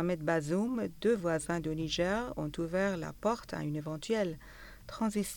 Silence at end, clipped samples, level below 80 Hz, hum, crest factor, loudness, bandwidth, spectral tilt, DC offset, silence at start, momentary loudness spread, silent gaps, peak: 0 s; under 0.1%; -56 dBFS; none; 16 dB; -34 LUFS; over 20 kHz; -5.5 dB/octave; under 0.1%; 0 s; 7 LU; none; -18 dBFS